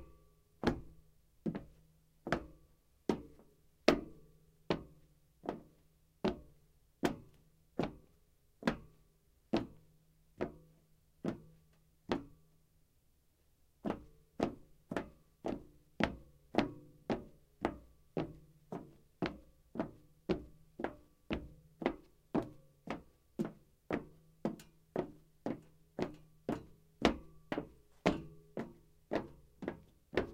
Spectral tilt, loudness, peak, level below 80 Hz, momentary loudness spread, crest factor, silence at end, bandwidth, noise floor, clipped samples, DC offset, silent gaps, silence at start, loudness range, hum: -6 dB/octave; -42 LUFS; -8 dBFS; -60 dBFS; 19 LU; 36 dB; 0 s; 16 kHz; -72 dBFS; under 0.1%; under 0.1%; none; 0 s; 5 LU; none